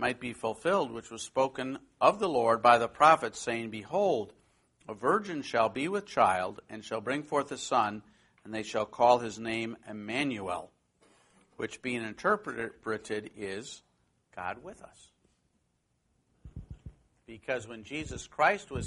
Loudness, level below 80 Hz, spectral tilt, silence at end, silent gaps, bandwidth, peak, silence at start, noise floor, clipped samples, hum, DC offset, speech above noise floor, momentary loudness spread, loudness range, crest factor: -30 LUFS; -60 dBFS; -4.5 dB/octave; 0 s; none; 11.5 kHz; -8 dBFS; 0 s; -76 dBFS; under 0.1%; none; under 0.1%; 45 dB; 19 LU; 17 LU; 24 dB